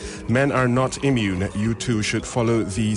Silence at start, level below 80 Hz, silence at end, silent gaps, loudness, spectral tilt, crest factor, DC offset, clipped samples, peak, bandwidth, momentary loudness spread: 0 s; -42 dBFS; 0 s; none; -22 LUFS; -5.5 dB/octave; 14 dB; under 0.1%; under 0.1%; -8 dBFS; 11 kHz; 5 LU